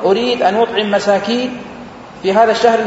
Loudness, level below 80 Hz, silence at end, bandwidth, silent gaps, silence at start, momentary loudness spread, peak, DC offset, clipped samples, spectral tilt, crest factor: -14 LUFS; -52 dBFS; 0 s; 8 kHz; none; 0 s; 19 LU; 0 dBFS; under 0.1%; under 0.1%; -4.5 dB/octave; 14 dB